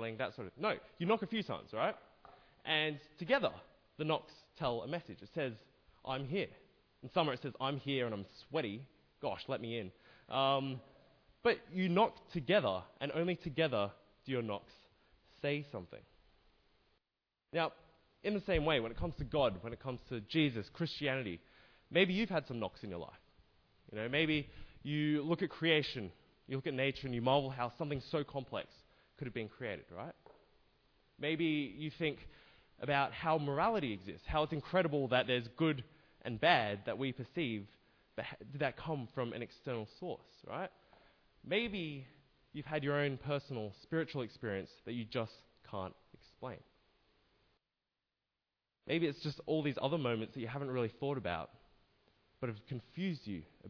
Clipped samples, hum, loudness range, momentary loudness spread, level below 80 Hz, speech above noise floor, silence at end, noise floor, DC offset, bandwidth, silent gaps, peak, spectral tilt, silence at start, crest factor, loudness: under 0.1%; none; 8 LU; 15 LU; -62 dBFS; over 53 dB; 0 s; under -90 dBFS; under 0.1%; 5.4 kHz; none; -16 dBFS; -4 dB/octave; 0 s; 24 dB; -38 LUFS